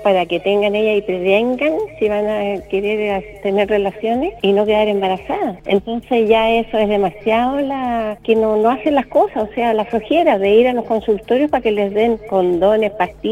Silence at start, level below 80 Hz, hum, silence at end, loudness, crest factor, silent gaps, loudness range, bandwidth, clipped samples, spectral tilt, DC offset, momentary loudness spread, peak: 0 s; -44 dBFS; none; 0 s; -16 LUFS; 16 dB; none; 2 LU; 12 kHz; under 0.1%; -7 dB/octave; under 0.1%; 6 LU; 0 dBFS